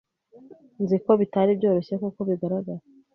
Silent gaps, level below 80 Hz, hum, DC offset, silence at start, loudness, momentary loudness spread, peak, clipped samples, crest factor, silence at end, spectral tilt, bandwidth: none; -68 dBFS; none; under 0.1%; 0.5 s; -24 LUFS; 10 LU; -6 dBFS; under 0.1%; 18 dB; 0.35 s; -10.5 dB/octave; 5.8 kHz